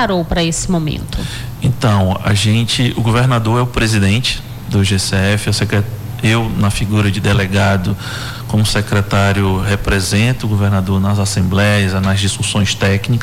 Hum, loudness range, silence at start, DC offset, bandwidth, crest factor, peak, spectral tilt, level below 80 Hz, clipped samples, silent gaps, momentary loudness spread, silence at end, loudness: none; 1 LU; 0 s; under 0.1%; 15.5 kHz; 8 dB; -4 dBFS; -5 dB/octave; -30 dBFS; under 0.1%; none; 6 LU; 0 s; -15 LUFS